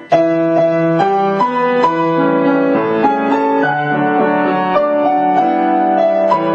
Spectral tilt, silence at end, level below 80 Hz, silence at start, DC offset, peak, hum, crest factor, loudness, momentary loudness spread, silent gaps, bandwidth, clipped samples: -8 dB/octave; 0 s; -60 dBFS; 0 s; under 0.1%; -2 dBFS; none; 12 dB; -13 LUFS; 2 LU; none; 8 kHz; under 0.1%